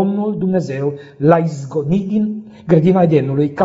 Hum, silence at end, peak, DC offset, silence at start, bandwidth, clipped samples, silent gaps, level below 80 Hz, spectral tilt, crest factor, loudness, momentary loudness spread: none; 0 s; 0 dBFS; under 0.1%; 0 s; 7.8 kHz; under 0.1%; none; -52 dBFS; -9 dB/octave; 16 dB; -16 LUFS; 10 LU